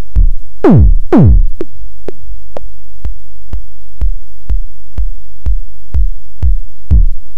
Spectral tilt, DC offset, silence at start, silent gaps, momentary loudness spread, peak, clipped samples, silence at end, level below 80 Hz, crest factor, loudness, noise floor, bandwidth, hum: -10.5 dB/octave; 50%; 0.1 s; none; 23 LU; 0 dBFS; 3%; 0.05 s; -14 dBFS; 14 dB; -14 LUFS; -30 dBFS; 3.7 kHz; none